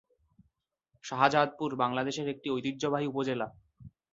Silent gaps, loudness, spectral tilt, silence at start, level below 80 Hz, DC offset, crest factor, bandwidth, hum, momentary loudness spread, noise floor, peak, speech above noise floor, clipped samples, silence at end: none; -31 LUFS; -5 dB/octave; 1.05 s; -70 dBFS; under 0.1%; 24 dB; 7.8 kHz; none; 11 LU; -77 dBFS; -8 dBFS; 47 dB; under 0.1%; 0.25 s